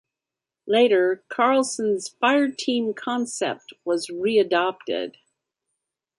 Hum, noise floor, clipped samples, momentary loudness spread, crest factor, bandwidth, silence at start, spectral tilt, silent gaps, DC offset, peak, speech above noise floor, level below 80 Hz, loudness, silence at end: none; -88 dBFS; under 0.1%; 10 LU; 18 dB; 11.5 kHz; 0.65 s; -3 dB/octave; none; under 0.1%; -6 dBFS; 66 dB; -74 dBFS; -23 LUFS; 1.1 s